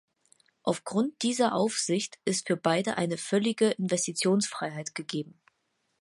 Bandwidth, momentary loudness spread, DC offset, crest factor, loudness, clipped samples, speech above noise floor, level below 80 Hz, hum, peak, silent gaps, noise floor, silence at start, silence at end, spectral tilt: 11.5 kHz; 9 LU; under 0.1%; 20 dB; -29 LUFS; under 0.1%; 48 dB; -76 dBFS; none; -10 dBFS; none; -77 dBFS; 0.65 s; 0.7 s; -4 dB/octave